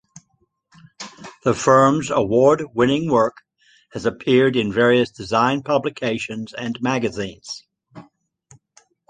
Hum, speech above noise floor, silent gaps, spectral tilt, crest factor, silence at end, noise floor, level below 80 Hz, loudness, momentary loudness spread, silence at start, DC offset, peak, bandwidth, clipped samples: none; 48 dB; none; -5.5 dB/octave; 18 dB; 1.1 s; -66 dBFS; -54 dBFS; -19 LUFS; 18 LU; 1 s; under 0.1%; -2 dBFS; 9.6 kHz; under 0.1%